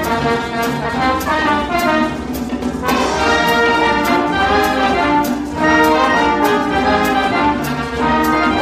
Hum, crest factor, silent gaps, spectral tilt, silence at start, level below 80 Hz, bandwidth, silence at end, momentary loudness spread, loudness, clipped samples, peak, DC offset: none; 14 dB; none; -4.5 dB/octave; 0 s; -34 dBFS; 15.5 kHz; 0 s; 7 LU; -15 LUFS; under 0.1%; -2 dBFS; under 0.1%